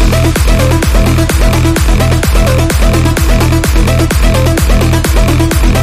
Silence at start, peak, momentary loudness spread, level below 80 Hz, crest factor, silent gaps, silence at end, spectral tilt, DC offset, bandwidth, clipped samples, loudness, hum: 0 s; 0 dBFS; 0 LU; -12 dBFS; 8 dB; none; 0 s; -5.5 dB/octave; under 0.1%; 16 kHz; under 0.1%; -10 LUFS; none